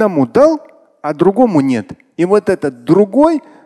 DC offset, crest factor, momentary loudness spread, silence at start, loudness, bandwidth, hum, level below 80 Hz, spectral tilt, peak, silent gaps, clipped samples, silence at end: under 0.1%; 12 dB; 12 LU; 0 s; -13 LUFS; 12 kHz; none; -50 dBFS; -8 dB/octave; 0 dBFS; none; under 0.1%; 0.25 s